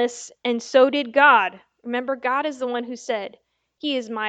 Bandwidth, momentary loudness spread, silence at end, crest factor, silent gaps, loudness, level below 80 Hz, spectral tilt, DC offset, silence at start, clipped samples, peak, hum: 9 kHz; 14 LU; 0 s; 20 dB; none; -21 LUFS; -76 dBFS; -2.5 dB/octave; under 0.1%; 0 s; under 0.1%; -2 dBFS; none